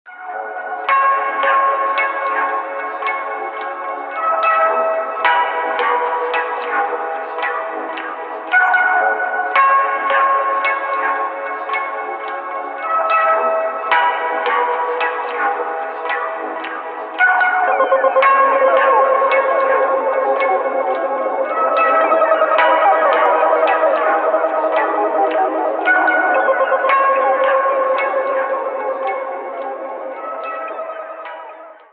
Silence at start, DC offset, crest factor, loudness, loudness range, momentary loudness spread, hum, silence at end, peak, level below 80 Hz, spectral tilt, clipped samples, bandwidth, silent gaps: 0.05 s; under 0.1%; 16 dB; -16 LUFS; 5 LU; 12 LU; none; 0.2 s; 0 dBFS; under -90 dBFS; -4.5 dB/octave; under 0.1%; 4.7 kHz; none